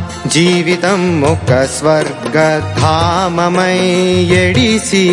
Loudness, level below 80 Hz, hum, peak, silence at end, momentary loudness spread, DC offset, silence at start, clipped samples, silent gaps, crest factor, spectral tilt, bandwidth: -12 LUFS; -40 dBFS; none; 0 dBFS; 0 s; 3 LU; under 0.1%; 0 s; under 0.1%; none; 12 dB; -5 dB/octave; 11.5 kHz